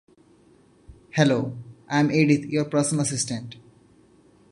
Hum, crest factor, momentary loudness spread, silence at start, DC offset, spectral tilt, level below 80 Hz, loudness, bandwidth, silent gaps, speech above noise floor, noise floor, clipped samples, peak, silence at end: none; 22 dB; 13 LU; 0.9 s; under 0.1%; -5 dB/octave; -60 dBFS; -23 LUFS; 11.5 kHz; none; 34 dB; -56 dBFS; under 0.1%; -2 dBFS; 0.9 s